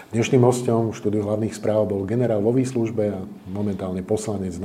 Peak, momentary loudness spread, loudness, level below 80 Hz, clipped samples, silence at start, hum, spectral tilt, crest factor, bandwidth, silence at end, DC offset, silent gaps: -4 dBFS; 10 LU; -22 LUFS; -60 dBFS; under 0.1%; 0 s; none; -7 dB/octave; 18 dB; 14.5 kHz; 0 s; under 0.1%; none